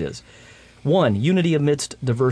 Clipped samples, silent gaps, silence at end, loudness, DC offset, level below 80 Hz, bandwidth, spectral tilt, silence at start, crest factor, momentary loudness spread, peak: under 0.1%; none; 0 s; -20 LUFS; under 0.1%; -54 dBFS; 11 kHz; -6.5 dB/octave; 0 s; 14 dB; 12 LU; -6 dBFS